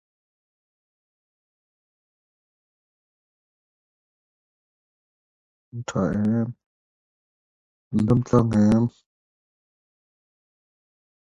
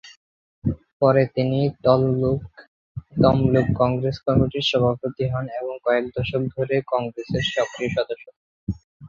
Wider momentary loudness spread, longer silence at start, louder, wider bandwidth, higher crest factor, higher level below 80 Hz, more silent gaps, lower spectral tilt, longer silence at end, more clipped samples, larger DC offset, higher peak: about the same, 12 LU vs 12 LU; first, 5.75 s vs 0.05 s; about the same, -22 LUFS vs -22 LUFS; first, 8.2 kHz vs 7.4 kHz; about the same, 24 dB vs 20 dB; second, -52 dBFS vs -44 dBFS; about the same, 6.66-7.91 s vs 0.17-0.62 s, 0.93-1.00 s, 2.68-2.95 s, 8.36-8.67 s, 8.84-9.00 s; first, -8.5 dB/octave vs -7 dB/octave; first, 2.35 s vs 0 s; neither; neither; about the same, -4 dBFS vs -2 dBFS